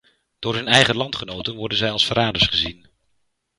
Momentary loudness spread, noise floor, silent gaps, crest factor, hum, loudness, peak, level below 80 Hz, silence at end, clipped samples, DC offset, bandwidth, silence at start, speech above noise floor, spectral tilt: 12 LU; -71 dBFS; none; 22 dB; none; -19 LUFS; 0 dBFS; -46 dBFS; 0.85 s; under 0.1%; under 0.1%; 11.5 kHz; 0.4 s; 50 dB; -3.5 dB/octave